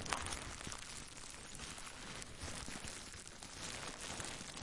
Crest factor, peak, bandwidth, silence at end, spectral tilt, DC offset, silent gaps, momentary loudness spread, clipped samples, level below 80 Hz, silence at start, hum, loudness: 30 dB; -16 dBFS; 11.5 kHz; 0 s; -2 dB/octave; under 0.1%; none; 6 LU; under 0.1%; -58 dBFS; 0 s; none; -47 LUFS